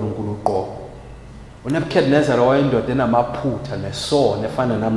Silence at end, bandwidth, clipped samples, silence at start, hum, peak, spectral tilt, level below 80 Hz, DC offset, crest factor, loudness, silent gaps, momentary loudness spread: 0 s; 12 kHz; under 0.1%; 0 s; none; -2 dBFS; -6.5 dB/octave; -42 dBFS; under 0.1%; 18 dB; -19 LUFS; none; 19 LU